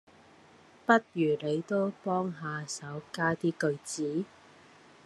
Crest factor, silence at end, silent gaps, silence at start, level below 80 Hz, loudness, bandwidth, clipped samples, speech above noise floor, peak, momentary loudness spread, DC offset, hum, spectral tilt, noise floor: 24 dB; 0.8 s; none; 0.9 s; -76 dBFS; -31 LUFS; 12.5 kHz; under 0.1%; 27 dB; -8 dBFS; 12 LU; under 0.1%; none; -5.5 dB/octave; -58 dBFS